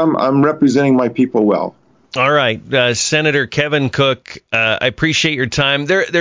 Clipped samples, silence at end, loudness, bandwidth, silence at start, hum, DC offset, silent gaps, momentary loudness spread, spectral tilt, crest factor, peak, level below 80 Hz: under 0.1%; 0 s; -14 LUFS; 7.6 kHz; 0 s; none; under 0.1%; none; 4 LU; -4.5 dB/octave; 14 dB; -2 dBFS; -48 dBFS